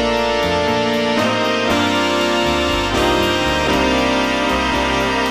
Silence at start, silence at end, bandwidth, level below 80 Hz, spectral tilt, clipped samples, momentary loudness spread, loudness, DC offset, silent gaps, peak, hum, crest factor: 0 s; 0 s; 19 kHz; -32 dBFS; -4 dB/octave; under 0.1%; 1 LU; -16 LUFS; 0.5%; none; -4 dBFS; none; 12 dB